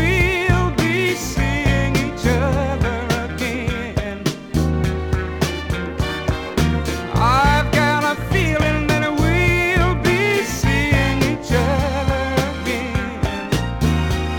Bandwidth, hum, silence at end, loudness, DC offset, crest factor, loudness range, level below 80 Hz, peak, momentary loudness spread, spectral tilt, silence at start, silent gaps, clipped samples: over 20 kHz; none; 0 s; -19 LUFS; under 0.1%; 16 dB; 5 LU; -28 dBFS; -2 dBFS; 7 LU; -5.5 dB/octave; 0 s; none; under 0.1%